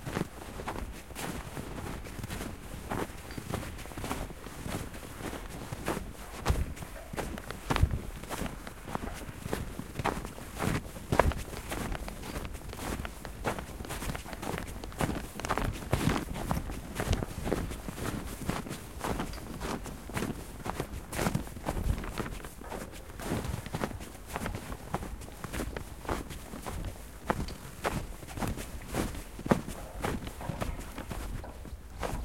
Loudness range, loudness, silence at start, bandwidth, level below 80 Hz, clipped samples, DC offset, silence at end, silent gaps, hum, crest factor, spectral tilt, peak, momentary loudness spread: 5 LU; -37 LUFS; 0 s; 16.5 kHz; -42 dBFS; under 0.1%; 0.2%; 0 s; none; none; 30 dB; -5 dB/octave; -6 dBFS; 9 LU